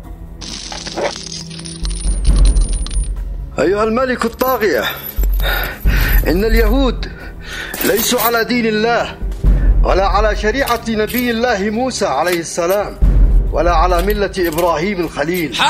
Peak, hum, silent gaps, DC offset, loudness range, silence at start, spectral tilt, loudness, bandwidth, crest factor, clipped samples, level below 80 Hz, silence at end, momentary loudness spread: 0 dBFS; none; none; under 0.1%; 3 LU; 0 s; -4.5 dB/octave; -16 LUFS; 16 kHz; 14 dB; under 0.1%; -18 dBFS; 0 s; 11 LU